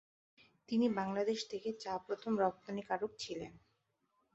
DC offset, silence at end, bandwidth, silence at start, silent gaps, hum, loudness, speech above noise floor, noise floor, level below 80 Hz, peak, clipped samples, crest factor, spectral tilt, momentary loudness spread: under 0.1%; 0.75 s; 8 kHz; 0.7 s; none; none; -38 LUFS; 43 dB; -81 dBFS; -76 dBFS; -20 dBFS; under 0.1%; 20 dB; -4.5 dB/octave; 10 LU